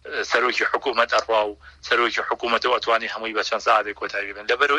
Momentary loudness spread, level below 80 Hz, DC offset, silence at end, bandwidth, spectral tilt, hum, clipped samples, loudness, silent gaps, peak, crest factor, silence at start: 8 LU; -56 dBFS; under 0.1%; 0 s; 11 kHz; -1.5 dB/octave; none; under 0.1%; -22 LUFS; none; -4 dBFS; 20 dB; 0.05 s